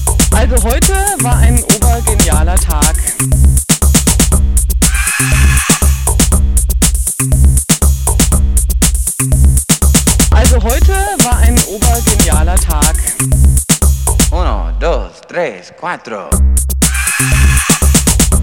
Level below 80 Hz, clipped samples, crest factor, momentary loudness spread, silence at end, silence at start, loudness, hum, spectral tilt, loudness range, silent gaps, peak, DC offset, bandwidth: -12 dBFS; under 0.1%; 10 dB; 5 LU; 0 s; 0 s; -11 LUFS; none; -4 dB/octave; 3 LU; none; 0 dBFS; 1%; 18 kHz